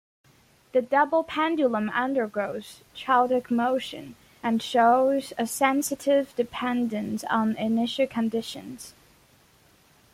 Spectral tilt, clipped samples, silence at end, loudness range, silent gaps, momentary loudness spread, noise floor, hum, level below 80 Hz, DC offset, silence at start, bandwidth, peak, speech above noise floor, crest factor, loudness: -4 dB/octave; under 0.1%; 1.25 s; 4 LU; none; 15 LU; -59 dBFS; none; -66 dBFS; under 0.1%; 0.75 s; 16.5 kHz; -8 dBFS; 34 dB; 18 dB; -25 LUFS